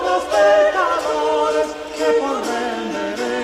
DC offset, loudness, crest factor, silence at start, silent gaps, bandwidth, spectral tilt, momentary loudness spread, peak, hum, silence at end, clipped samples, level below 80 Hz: under 0.1%; -18 LUFS; 14 dB; 0 s; none; 15 kHz; -3 dB/octave; 9 LU; -4 dBFS; none; 0 s; under 0.1%; -52 dBFS